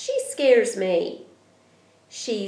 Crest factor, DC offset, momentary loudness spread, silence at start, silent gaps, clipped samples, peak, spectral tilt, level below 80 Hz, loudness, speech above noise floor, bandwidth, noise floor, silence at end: 18 dB; under 0.1%; 20 LU; 0 s; none; under 0.1%; -6 dBFS; -3.5 dB/octave; -86 dBFS; -22 LUFS; 36 dB; 11 kHz; -58 dBFS; 0 s